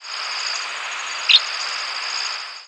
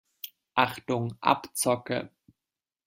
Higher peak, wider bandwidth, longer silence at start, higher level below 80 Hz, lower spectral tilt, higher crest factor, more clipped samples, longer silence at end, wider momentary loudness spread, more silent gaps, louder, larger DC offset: first, -2 dBFS vs -6 dBFS; second, 11 kHz vs 16.5 kHz; second, 0 s vs 0.25 s; second, -84 dBFS vs -68 dBFS; second, 4.5 dB/octave vs -4 dB/octave; about the same, 22 dB vs 26 dB; neither; second, 0 s vs 0.8 s; second, 12 LU vs 16 LU; neither; first, -20 LUFS vs -28 LUFS; neither